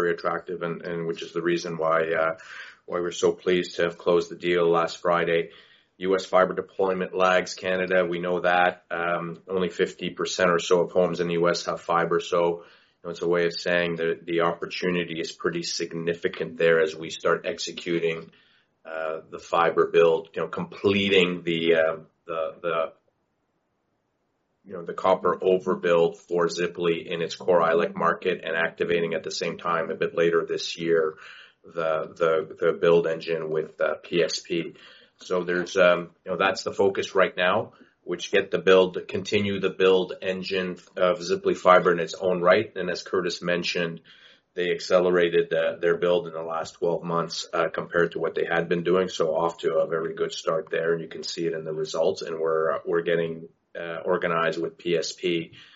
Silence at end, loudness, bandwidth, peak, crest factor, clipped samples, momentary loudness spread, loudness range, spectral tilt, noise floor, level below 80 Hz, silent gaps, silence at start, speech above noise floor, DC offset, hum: 0.15 s; -25 LUFS; 8 kHz; -4 dBFS; 22 dB; under 0.1%; 10 LU; 4 LU; -3 dB/octave; -74 dBFS; -68 dBFS; none; 0 s; 49 dB; under 0.1%; none